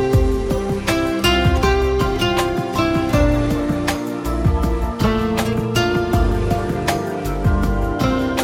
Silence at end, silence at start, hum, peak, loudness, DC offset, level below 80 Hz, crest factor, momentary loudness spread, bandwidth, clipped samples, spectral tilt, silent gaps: 0 s; 0 s; none; -6 dBFS; -19 LUFS; under 0.1%; -24 dBFS; 12 dB; 4 LU; 16.5 kHz; under 0.1%; -6 dB/octave; none